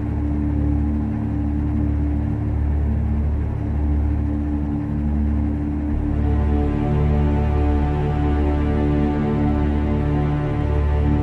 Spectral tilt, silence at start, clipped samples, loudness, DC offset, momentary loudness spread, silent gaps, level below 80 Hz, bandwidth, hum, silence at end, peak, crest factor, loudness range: -10.5 dB/octave; 0 s; under 0.1%; -21 LUFS; under 0.1%; 4 LU; none; -22 dBFS; 4.2 kHz; none; 0 s; -8 dBFS; 12 dB; 2 LU